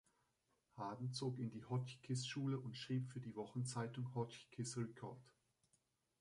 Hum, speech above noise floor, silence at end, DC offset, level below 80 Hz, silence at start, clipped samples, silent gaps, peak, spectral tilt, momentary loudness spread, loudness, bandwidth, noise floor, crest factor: none; 38 dB; 0.9 s; under 0.1%; -82 dBFS; 0.75 s; under 0.1%; none; -30 dBFS; -5.5 dB/octave; 7 LU; -47 LUFS; 11.5 kHz; -84 dBFS; 16 dB